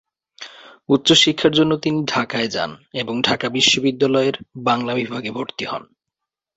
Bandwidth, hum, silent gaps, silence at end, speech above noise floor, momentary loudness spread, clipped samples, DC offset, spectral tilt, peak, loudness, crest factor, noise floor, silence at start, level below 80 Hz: 8.2 kHz; none; none; 0.75 s; 64 dB; 14 LU; under 0.1%; under 0.1%; -3.5 dB/octave; 0 dBFS; -18 LUFS; 20 dB; -83 dBFS; 0.4 s; -58 dBFS